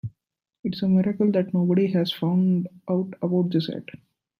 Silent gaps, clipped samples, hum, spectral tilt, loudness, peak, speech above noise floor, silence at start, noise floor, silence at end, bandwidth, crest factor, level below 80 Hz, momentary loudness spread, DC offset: 0.59-0.63 s; under 0.1%; none; -9 dB/octave; -24 LUFS; -10 dBFS; 43 dB; 0.05 s; -66 dBFS; 0.55 s; 5.6 kHz; 14 dB; -64 dBFS; 12 LU; under 0.1%